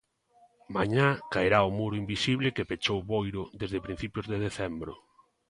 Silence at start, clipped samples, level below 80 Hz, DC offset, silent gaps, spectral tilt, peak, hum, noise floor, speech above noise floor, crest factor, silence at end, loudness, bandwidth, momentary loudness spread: 0.7 s; under 0.1%; -52 dBFS; under 0.1%; none; -6 dB/octave; -8 dBFS; none; -64 dBFS; 34 dB; 22 dB; 0.55 s; -30 LUFS; 11.5 kHz; 11 LU